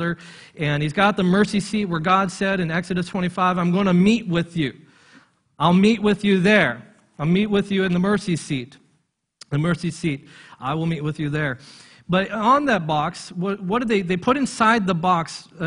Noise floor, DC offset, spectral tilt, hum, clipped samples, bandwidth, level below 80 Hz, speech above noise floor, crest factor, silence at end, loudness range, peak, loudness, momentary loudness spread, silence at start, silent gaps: -68 dBFS; under 0.1%; -6 dB/octave; none; under 0.1%; 10.5 kHz; -52 dBFS; 48 dB; 20 dB; 0 s; 6 LU; -2 dBFS; -21 LUFS; 11 LU; 0 s; none